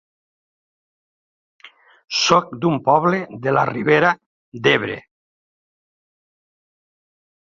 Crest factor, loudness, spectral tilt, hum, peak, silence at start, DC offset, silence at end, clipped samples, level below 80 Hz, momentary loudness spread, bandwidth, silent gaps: 20 dB; -18 LUFS; -4.5 dB/octave; none; -2 dBFS; 1.65 s; under 0.1%; 2.4 s; under 0.1%; -62 dBFS; 8 LU; 7.6 kHz; 4.26-4.52 s